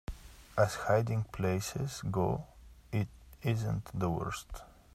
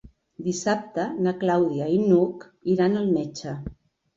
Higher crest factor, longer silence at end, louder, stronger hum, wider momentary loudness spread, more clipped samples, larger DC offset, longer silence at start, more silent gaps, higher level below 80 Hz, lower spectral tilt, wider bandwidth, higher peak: about the same, 20 dB vs 18 dB; second, 0.25 s vs 0.45 s; second, -34 LUFS vs -24 LUFS; neither; first, 16 LU vs 13 LU; neither; neither; about the same, 0.1 s vs 0.05 s; neither; about the same, -52 dBFS vs -54 dBFS; about the same, -6 dB/octave vs -6.5 dB/octave; first, 14.5 kHz vs 7.8 kHz; second, -16 dBFS vs -6 dBFS